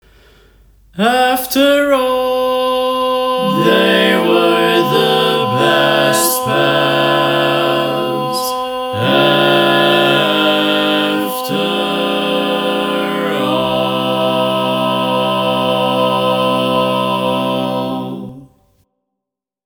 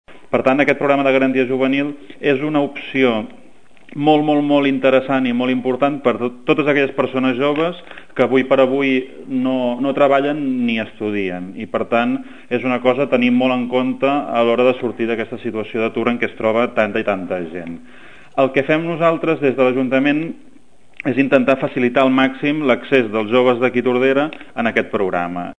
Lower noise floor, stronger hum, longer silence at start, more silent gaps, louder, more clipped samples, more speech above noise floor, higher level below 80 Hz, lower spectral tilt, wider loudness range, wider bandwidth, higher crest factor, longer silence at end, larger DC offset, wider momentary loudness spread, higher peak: first, -81 dBFS vs -51 dBFS; neither; first, 0.95 s vs 0.05 s; neither; first, -13 LUFS vs -17 LUFS; neither; first, 69 dB vs 34 dB; first, -52 dBFS vs -60 dBFS; second, -4 dB/octave vs -7 dB/octave; about the same, 4 LU vs 3 LU; first, over 20 kHz vs 8.8 kHz; about the same, 14 dB vs 18 dB; first, 1.2 s vs 0 s; second, under 0.1% vs 1%; about the same, 7 LU vs 9 LU; about the same, 0 dBFS vs 0 dBFS